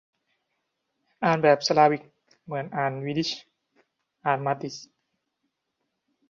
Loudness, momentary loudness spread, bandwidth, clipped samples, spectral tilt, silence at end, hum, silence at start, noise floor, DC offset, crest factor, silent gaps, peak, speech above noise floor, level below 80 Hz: -25 LUFS; 15 LU; 7.6 kHz; under 0.1%; -5 dB/octave; 1.45 s; none; 1.2 s; -80 dBFS; under 0.1%; 22 dB; none; -6 dBFS; 56 dB; -72 dBFS